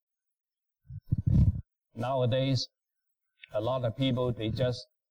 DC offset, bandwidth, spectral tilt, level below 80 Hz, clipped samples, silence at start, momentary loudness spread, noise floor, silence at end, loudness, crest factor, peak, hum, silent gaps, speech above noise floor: under 0.1%; 9.2 kHz; -7.5 dB/octave; -42 dBFS; under 0.1%; 0.9 s; 15 LU; -84 dBFS; 0.25 s; -30 LUFS; 16 dB; -14 dBFS; none; none; 55 dB